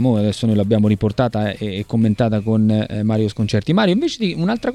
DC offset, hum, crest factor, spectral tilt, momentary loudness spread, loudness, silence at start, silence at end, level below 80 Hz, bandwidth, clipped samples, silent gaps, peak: under 0.1%; none; 16 dB; -7.5 dB/octave; 4 LU; -18 LUFS; 0 s; 0 s; -44 dBFS; 11 kHz; under 0.1%; none; -2 dBFS